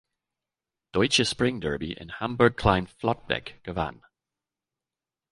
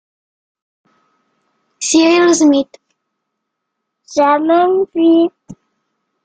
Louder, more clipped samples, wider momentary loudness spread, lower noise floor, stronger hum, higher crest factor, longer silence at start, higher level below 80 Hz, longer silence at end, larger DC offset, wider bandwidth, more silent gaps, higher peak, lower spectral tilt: second, -26 LUFS vs -12 LUFS; neither; about the same, 11 LU vs 10 LU; first, under -90 dBFS vs -75 dBFS; neither; first, 24 dB vs 14 dB; second, 0.95 s vs 1.8 s; first, -46 dBFS vs -62 dBFS; first, 1.4 s vs 0.7 s; neither; first, 11.5 kHz vs 9.4 kHz; neither; about the same, -4 dBFS vs -2 dBFS; first, -4.5 dB/octave vs -2.5 dB/octave